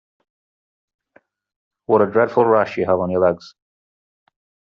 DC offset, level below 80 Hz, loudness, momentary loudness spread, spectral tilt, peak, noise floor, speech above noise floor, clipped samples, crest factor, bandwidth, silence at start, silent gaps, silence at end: under 0.1%; -64 dBFS; -17 LUFS; 6 LU; -6 dB/octave; -2 dBFS; -58 dBFS; 41 dB; under 0.1%; 18 dB; 6.8 kHz; 1.9 s; none; 1.2 s